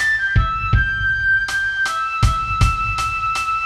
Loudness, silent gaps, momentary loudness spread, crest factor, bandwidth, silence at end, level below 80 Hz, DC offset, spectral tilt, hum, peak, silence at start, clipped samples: -18 LUFS; none; 3 LU; 16 dB; 14 kHz; 0 s; -26 dBFS; under 0.1%; -3.5 dB/octave; none; -2 dBFS; 0 s; under 0.1%